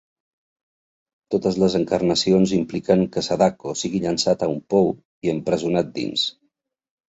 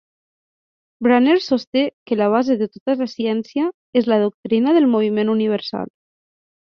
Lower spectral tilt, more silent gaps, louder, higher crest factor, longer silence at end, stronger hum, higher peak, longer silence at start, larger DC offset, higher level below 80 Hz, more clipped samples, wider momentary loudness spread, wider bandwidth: about the same, -5.5 dB/octave vs -6.5 dB/octave; second, 5.05-5.21 s vs 1.67-1.72 s, 1.93-2.06 s, 2.80-2.86 s, 3.74-3.93 s, 4.34-4.43 s; second, -21 LUFS vs -18 LUFS; about the same, 20 dB vs 18 dB; about the same, 0.85 s vs 0.8 s; neither; about the same, -2 dBFS vs -2 dBFS; first, 1.3 s vs 1 s; neither; first, -54 dBFS vs -64 dBFS; neither; about the same, 7 LU vs 8 LU; first, 8 kHz vs 6.6 kHz